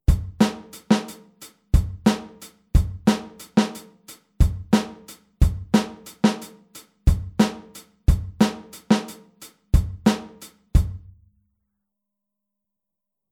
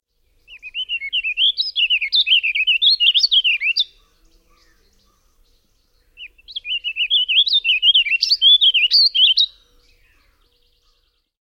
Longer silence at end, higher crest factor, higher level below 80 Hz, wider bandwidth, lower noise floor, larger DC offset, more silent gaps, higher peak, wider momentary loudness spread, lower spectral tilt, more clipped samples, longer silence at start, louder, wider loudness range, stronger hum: first, 2.35 s vs 1.9 s; about the same, 20 dB vs 16 dB; first, -28 dBFS vs -58 dBFS; about the same, 17 kHz vs 16 kHz; first, -85 dBFS vs -64 dBFS; neither; neither; about the same, -4 dBFS vs -4 dBFS; first, 20 LU vs 13 LU; first, -6.5 dB/octave vs 4.5 dB/octave; neither; second, 0.1 s vs 0.5 s; second, -23 LUFS vs -13 LUFS; second, 3 LU vs 11 LU; neither